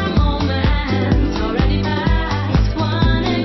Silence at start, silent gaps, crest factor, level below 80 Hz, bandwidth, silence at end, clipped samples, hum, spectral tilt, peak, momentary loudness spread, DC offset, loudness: 0 s; none; 14 dB; -20 dBFS; 6 kHz; 0 s; under 0.1%; none; -7.5 dB/octave; -2 dBFS; 2 LU; under 0.1%; -18 LUFS